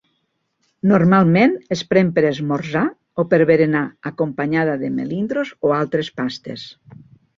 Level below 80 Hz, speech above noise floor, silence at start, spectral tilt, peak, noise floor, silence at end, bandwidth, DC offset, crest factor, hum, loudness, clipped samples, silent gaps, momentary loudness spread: -56 dBFS; 52 dB; 0.85 s; -7.5 dB/octave; -2 dBFS; -70 dBFS; 0.65 s; 7.4 kHz; under 0.1%; 16 dB; none; -18 LUFS; under 0.1%; none; 12 LU